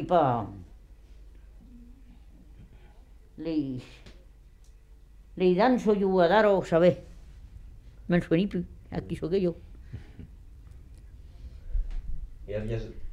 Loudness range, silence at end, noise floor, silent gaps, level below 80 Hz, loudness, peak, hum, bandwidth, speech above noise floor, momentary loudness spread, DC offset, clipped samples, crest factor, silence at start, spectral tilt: 15 LU; 0 s; -52 dBFS; none; -42 dBFS; -27 LUFS; -8 dBFS; none; 11 kHz; 27 dB; 25 LU; under 0.1%; under 0.1%; 20 dB; 0 s; -8 dB/octave